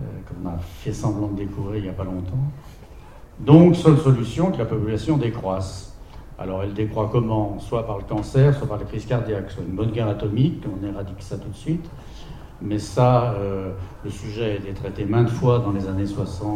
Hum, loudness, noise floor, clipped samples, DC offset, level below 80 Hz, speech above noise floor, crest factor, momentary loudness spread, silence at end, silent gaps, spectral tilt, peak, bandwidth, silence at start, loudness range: none; -22 LUFS; -42 dBFS; under 0.1%; 0.1%; -40 dBFS; 20 dB; 22 dB; 16 LU; 0 s; none; -8.5 dB/octave; 0 dBFS; 11 kHz; 0 s; 8 LU